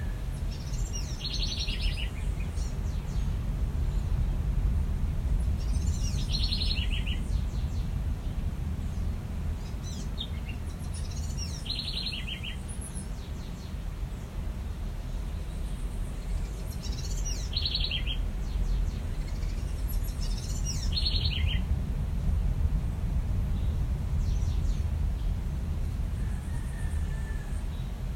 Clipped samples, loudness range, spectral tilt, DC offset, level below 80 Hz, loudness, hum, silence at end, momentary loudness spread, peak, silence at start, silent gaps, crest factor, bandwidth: under 0.1%; 6 LU; -5 dB/octave; under 0.1%; -32 dBFS; -33 LUFS; none; 0 s; 8 LU; -14 dBFS; 0 s; none; 16 dB; 15 kHz